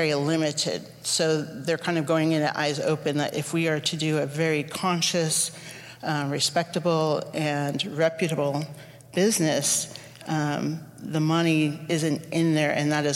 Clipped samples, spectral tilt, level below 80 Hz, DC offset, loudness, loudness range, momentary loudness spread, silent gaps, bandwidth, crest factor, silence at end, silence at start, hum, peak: under 0.1%; -4 dB/octave; -68 dBFS; under 0.1%; -25 LUFS; 1 LU; 8 LU; none; 16.5 kHz; 16 dB; 0 s; 0 s; none; -10 dBFS